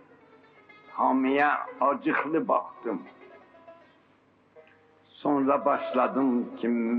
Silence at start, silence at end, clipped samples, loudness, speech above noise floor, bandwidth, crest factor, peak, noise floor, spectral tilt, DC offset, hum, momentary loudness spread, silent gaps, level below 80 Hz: 0.9 s; 0 s; under 0.1%; -27 LUFS; 36 dB; 4.7 kHz; 18 dB; -10 dBFS; -62 dBFS; -8.5 dB/octave; under 0.1%; none; 11 LU; none; -80 dBFS